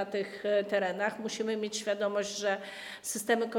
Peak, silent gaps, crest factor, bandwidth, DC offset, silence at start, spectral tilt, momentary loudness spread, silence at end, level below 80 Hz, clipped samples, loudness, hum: -16 dBFS; none; 16 dB; 18 kHz; under 0.1%; 0 s; -3 dB/octave; 7 LU; 0 s; -78 dBFS; under 0.1%; -32 LUFS; none